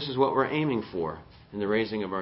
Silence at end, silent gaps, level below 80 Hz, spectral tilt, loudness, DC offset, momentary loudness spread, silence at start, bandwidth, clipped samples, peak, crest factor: 0 s; none; -58 dBFS; -10.5 dB/octave; -28 LUFS; under 0.1%; 12 LU; 0 s; 5.8 kHz; under 0.1%; -10 dBFS; 18 dB